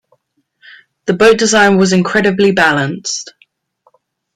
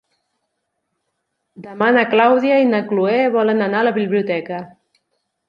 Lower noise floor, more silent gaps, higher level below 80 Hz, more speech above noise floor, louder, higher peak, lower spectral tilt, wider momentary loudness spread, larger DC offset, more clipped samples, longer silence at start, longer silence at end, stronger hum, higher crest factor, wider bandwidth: second, -61 dBFS vs -74 dBFS; neither; first, -50 dBFS vs -68 dBFS; second, 50 dB vs 58 dB; first, -11 LUFS vs -16 LUFS; about the same, 0 dBFS vs -2 dBFS; second, -4 dB/octave vs -8 dB/octave; about the same, 12 LU vs 10 LU; neither; neither; second, 1.05 s vs 1.6 s; first, 1.1 s vs 0.8 s; neither; about the same, 14 dB vs 16 dB; first, 12 kHz vs 6.8 kHz